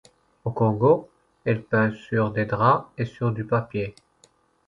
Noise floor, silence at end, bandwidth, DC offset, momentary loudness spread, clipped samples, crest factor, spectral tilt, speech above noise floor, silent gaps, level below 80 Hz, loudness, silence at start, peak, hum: -61 dBFS; 0.75 s; 7.4 kHz; under 0.1%; 11 LU; under 0.1%; 20 dB; -9 dB/octave; 38 dB; none; -56 dBFS; -24 LUFS; 0.45 s; -4 dBFS; none